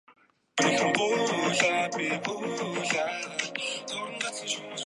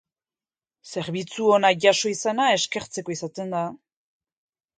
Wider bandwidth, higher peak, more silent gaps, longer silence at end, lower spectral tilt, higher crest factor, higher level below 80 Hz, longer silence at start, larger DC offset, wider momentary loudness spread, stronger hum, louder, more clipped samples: first, 11.5 kHz vs 9.6 kHz; second, -8 dBFS vs -4 dBFS; neither; second, 0 s vs 1 s; about the same, -2.5 dB/octave vs -3 dB/octave; about the same, 22 dB vs 22 dB; second, -78 dBFS vs -68 dBFS; second, 0.1 s vs 0.85 s; neither; second, 9 LU vs 13 LU; neither; second, -28 LUFS vs -23 LUFS; neither